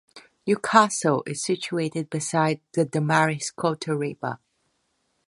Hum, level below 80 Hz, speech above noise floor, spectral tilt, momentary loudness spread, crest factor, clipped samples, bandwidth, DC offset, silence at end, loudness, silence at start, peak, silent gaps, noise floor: none; -70 dBFS; 48 dB; -4.5 dB/octave; 11 LU; 24 dB; under 0.1%; 11.5 kHz; under 0.1%; 0.9 s; -24 LUFS; 0.15 s; -2 dBFS; none; -72 dBFS